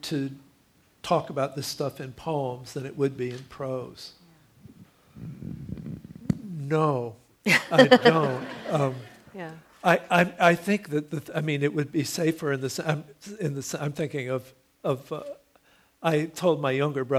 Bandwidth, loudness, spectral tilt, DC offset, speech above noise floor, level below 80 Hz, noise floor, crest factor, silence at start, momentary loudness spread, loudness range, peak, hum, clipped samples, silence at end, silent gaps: 16 kHz; -26 LUFS; -5.5 dB/octave; under 0.1%; 37 dB; -62 dBFS; -62 dBFS; 24 dB; 0.05 s; 19 LU; 12 LU; -2 dBFS; none; under 0.1%; 0 s; none